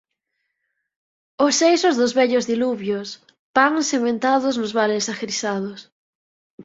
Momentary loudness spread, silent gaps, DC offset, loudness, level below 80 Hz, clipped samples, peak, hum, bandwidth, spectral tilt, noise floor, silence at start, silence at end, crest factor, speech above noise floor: 11 LU; 3.39-3.54 s, 5.92-6.58 s; under 0.1%; -20 LUFS; -66 dBFS; under 0.1%; -2 dBFS; none; 7.8 kHz; -3 dB/octave; -76 dBFS; 1.4 s; 0 s; 20 dB; 57 dB